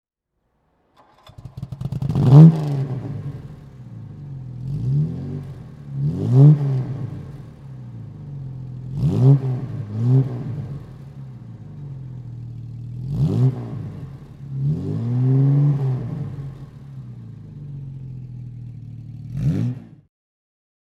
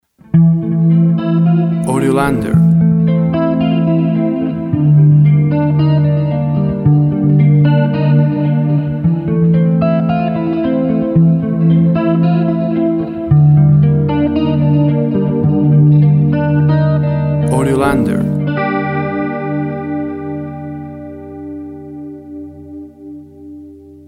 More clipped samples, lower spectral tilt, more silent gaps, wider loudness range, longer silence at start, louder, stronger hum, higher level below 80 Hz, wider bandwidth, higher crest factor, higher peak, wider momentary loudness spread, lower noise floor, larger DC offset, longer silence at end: neither; about the same, -10.5 dB/octave vs -9.5 dB/octave; neither; about the same, 12 LU vs 10 LU; first, 1.4 s vs 0.35 s; second, -19 LUFS vs -12 LUFS; neither; second, -46 dBFS vs -40 dBFS; second, 5.2 kHz vs 11 kHz; first, 20 dB vs 12 dB; about the same, 0 dBFS vs 0 dBFS; first, 22 LU vs 17 LU; first, -73 dBFS vs -35 dBFS; neither; first, 1 s vs 0.15 s